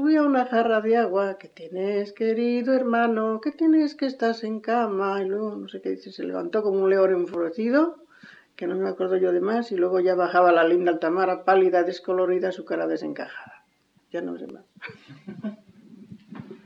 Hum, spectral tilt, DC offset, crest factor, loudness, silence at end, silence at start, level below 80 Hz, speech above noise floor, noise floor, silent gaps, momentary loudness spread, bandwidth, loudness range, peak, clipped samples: none; -7 dB/octave; under 0.1%; 16 dB; -23 LUFS; 0.1 s; 0 s; -78 dBFS; 42 dB; -65 dBFS; none; 17 LU; 7.4 kHz; 9 LU; -8 dBFS; under 0.1%